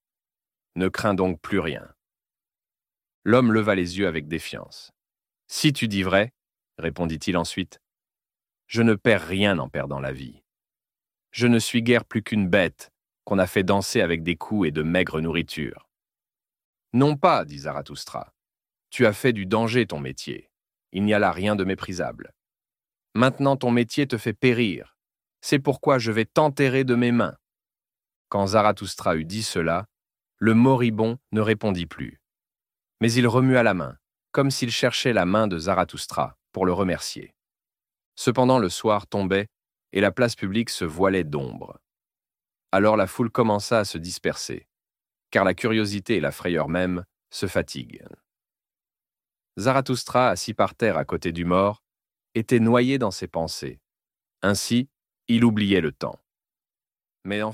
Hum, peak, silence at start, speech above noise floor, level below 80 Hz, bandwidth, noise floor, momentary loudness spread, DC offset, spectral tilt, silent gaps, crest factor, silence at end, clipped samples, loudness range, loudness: none; -2 dBFS; 0.75 s; over 67 dB; -54 dBFS; 16 kHz; under -90 dBFS; 14 LU; under 0.1%; -5.5 dB/octave; 3.14-3.22 s, 16.64-16.73 s, 28.16-28.25 s, 38.06-38.12 s; 22 dB; 0 s; under 0.1%; 4 LU; -23 LUFS